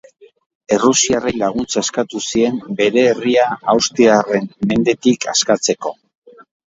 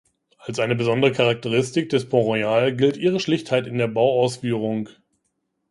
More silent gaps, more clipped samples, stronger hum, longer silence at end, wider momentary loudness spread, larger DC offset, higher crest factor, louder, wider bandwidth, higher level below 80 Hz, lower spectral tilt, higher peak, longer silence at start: neither; neither; neither; about the same, 0.8 s vs 0.85 s; about the same, 7 LU vs 7 LU; neither; about the same, 16 dB vs 18 dB; first, -15 LUFS vs -21 LUFS; second, 8 kHz vs 11.5 kHz; first, -52 dBFS vs -62 dBFS; second, -3.5 dB/octave vs -6 dB/octave; about the same, 0 dBFS vs -2 dBFS; first, 0.7 s vs 0.45 s